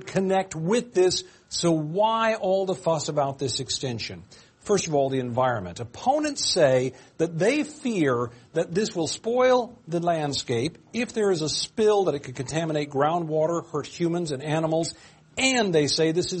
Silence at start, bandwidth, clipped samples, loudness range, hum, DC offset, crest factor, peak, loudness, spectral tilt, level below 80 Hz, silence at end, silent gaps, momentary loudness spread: 0 s; 8.8 kHz; under 0.1%; 2 LU; none; under 0.1%; 18 dB; -8 dBFS; -25 LUFS; -4.5 dB/octave; -60 dBFS; 0 s; none; 9 LU